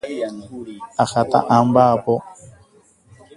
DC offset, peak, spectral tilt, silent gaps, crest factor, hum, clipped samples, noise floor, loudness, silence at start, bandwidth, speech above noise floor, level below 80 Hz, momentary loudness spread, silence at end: under 0.1%; 0 dBFS; -6.5 dB/octave; none; 20 dB; none; under 0.1%; -53 dBFS; -18 LUFS; 0.05 s; 11.5 kHz; 35 dB; -56 dBFS; 19 LU; 0.85 s